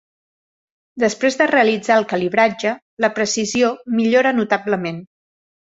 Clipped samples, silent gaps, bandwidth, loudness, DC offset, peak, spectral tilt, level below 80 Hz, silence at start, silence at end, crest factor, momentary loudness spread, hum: under 0.1%; 2.82-2.97 s; 8 kHz; -18 LUFS; under 0.1%; 0 dBFS; -4 dB/octave; -62 dBFS; 0.95 s; 0.75 s; 18 dB; 8 LU; none